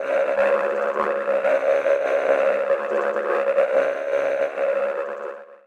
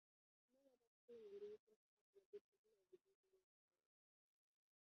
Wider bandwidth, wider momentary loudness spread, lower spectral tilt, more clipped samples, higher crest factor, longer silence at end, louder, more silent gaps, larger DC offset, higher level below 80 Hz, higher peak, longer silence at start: first, 8.6 kHz vs 6 kHz; second, 4 LU vs 8 LU; about the same, -4.5 dB/octave vs -4.5 dB/octave; neither; second, 14 dB vs 20 dB; second, 0.1 s vs 1.5 s; first, -21 LUFS vs -63 LUFS; second, none vs 0.87-1.08 s, 1.59-1.67 s, 1.76-2.13 s, 2.26-2.33 s, 2.41-2.52 s, 2.58-2.64 s, 3.15-3.23 s; neither; first, -74 dBFS vs under -90 dBFS; first, -6 dBFS vs -48 dBFS; second, 0 s vs 0.55 s